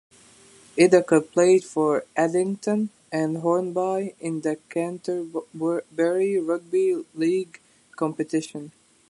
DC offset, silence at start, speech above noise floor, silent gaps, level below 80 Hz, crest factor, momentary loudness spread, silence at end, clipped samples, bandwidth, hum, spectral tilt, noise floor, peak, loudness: under 0.1%; 0.75 s; 29 dB; none; -74 dBFS; 20 dB; 11 LU; 0.4 s; under 0.1%; 11.5 kHz; none; -6 dB/octave; -52 dBFS; -4 dBFS; -24 LUFS